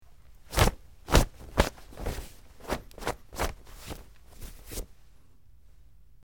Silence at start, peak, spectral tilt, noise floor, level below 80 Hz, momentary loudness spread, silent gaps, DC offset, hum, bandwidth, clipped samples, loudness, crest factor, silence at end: 0.5 s; -2 dBFS; -4.5 dB/octave; -58 dBFS; -36 dBFS; 22 LU; none; 0.2%; none; 17.5 kHz; under 0.1%; -31 LUFS; 30 dB; 1.4 s